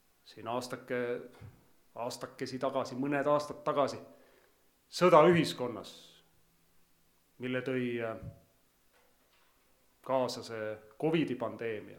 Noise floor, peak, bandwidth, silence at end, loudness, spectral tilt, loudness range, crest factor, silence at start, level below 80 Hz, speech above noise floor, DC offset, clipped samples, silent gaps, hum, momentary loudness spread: -69 dBFS; -8 dBFS; 18 kHz; 0 s; -32 LUFS; -6 dB/octave; 11 LU; 26 dB; 0.25 s; -72 dBFS; 37 dB; under 0.1%; under 0.1%; none; none; 20 LU